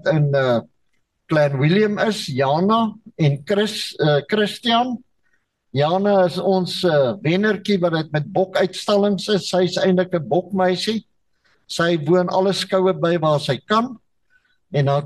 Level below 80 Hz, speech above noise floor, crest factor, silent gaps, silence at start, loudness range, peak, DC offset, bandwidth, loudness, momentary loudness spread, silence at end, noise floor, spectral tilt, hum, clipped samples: -62 dBFS; 49 dB; 12 dB; none; 0.05 s; 1 LU; -6 dBFS; under 0.1%; 12.5 kHz; -19 LUFS; 5 LU; 0 s; -68 dBFS; -6 dB/octave; none; under 0.1%